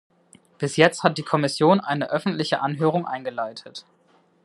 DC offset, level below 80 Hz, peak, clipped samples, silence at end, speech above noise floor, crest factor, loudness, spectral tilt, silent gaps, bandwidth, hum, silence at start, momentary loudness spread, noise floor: under 0.1%; -70 dBFS; 0 dBFS; under 0.1%; 0.65 s; 38 dB; 24 dB; -22 LUFS; -5.5 dB/octave; none; 12 kHz; none; 0.6 s; 13 LU; -60 dBFS